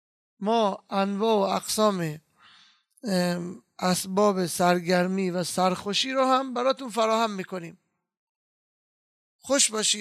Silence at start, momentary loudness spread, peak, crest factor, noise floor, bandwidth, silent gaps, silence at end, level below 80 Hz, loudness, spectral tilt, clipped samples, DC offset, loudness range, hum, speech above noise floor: 0.4 s; 12 LU; -8 dBFS; 18 dB; -59 dBFS; 14 kHz; 8.17-9.39 s; 0 s; -72 dBFS; -25 LUFS; -3.5 dB/octave; under 0.1%; under 0.1%; 4 LU; none; 34 dB